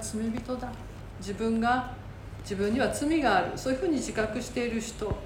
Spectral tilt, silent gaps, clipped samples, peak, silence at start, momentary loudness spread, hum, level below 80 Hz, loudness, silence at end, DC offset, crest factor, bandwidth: -5 dB/octave; none; under 0.1%; -12 dBFS; 0 s; 15 LU; none; -46 dBFS; -29 LUFS; 0 s; under 0.1%; 18 dB; 17 kHz